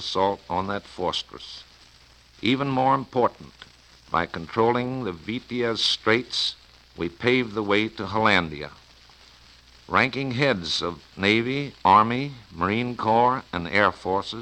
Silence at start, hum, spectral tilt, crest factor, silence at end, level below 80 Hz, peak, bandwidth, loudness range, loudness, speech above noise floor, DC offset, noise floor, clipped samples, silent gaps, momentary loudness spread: 0 s; none; -5 dB/octave; 22 dB; 0 s; -54 dBFS; -4 dBFS; 10.5 kHz; 4 LU; -24 LUFS; 29 dB; under 0.1%; -53 dBFS; under 0.1%; none; 12 LU